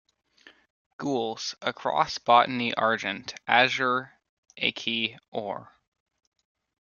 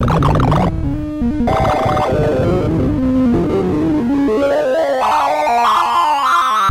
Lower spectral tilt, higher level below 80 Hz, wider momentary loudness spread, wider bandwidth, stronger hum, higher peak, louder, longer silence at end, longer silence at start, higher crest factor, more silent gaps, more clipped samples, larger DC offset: second, -3.5 dB/octave vs -7 dB/octave; second, -72 dBFS vs -28 dBFS; first, 14 LU vs 3 LU; second, 7.2 kHz vs 16 kHz; neither; about the same, -4 dBFS vs -2 dBFS; second, -26 LUFS vs -15 LUFS; first, 1.2 s vs 0 s; first, 1 s vs 0 s; first, 24 dB vs 12 dB; first, 4.29-4.43 s, 5.28-5.32 s vs none; neither; neither